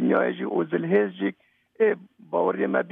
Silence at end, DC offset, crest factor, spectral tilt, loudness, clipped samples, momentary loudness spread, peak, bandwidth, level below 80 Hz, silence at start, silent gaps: 0 s; under 0.1%; 16 dB; -10 dB/octave; -25 LUFS; under 0.1%; 8 LU; -8 dBFS; 3.8 kHz; -78 dBFS; 0 s; none